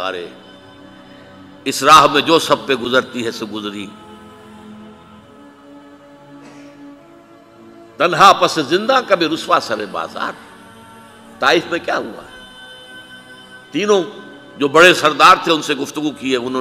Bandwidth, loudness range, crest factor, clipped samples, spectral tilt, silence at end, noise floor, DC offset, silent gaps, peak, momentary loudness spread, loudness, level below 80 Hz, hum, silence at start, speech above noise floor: 16 kHz; 10 LU; 18 dB; under 0.1%; -3 dB/octave; 0 s; -43 dBFS; under 0.1%; none; 0 dBFS; 26 LU; -14 LUFS; -56 dBFS; none; 0 s; 29 dB